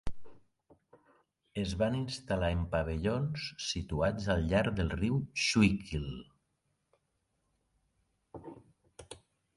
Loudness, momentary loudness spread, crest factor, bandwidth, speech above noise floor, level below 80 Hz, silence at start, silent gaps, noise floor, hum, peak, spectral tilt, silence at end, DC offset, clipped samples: -33 LUFS; 22 LU; 22 dB; 11.5 kHz; 48 dB; -46 dBFS; 0.05 s; none; -80 dBFS; none; -14 dBFS; -5.5 dB/octave; 0.4 s; under 0.1%; under 0.1%